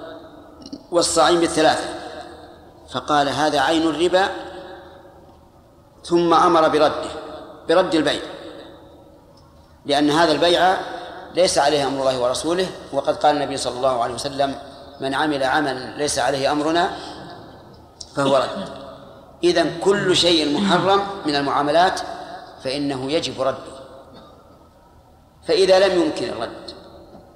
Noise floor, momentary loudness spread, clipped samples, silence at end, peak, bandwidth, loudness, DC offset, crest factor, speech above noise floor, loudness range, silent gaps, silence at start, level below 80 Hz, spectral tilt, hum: -50 dBFS; 21 LU; under 0.1%; 0.15 s; -4 dBFS; 14.5 kHz; -19 LUFS; under 0.1%; 18 dB; 31 dB; 4 LU; none; 0 s; -52 dBFS; -4 dB/octave; none